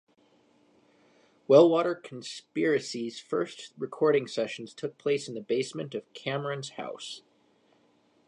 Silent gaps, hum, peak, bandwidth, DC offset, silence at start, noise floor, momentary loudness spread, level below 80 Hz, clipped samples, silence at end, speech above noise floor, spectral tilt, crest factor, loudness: none; none; -6 dBFS; 11 kHz; under 0.1%; 1.5 s; -66 dBFS; 17 LU; -84 dBFS; under 0.1%; 1.1 s; 38 dB; -5.5 dB/octave; 22 dB; -29 LUFS